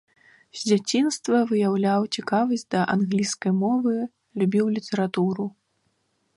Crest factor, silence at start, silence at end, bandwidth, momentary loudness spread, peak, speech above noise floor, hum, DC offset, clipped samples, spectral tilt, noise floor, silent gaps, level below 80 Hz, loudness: 16 dB; 0.55 s; 0.9 s; 11.5 kHz; 7 LU; -8 dBFS; 48 dB; none; under 0.1%; under 0.1%; -5.5 dB/octave; -71 dBFS; none; -70 dBFS; -24 LUFS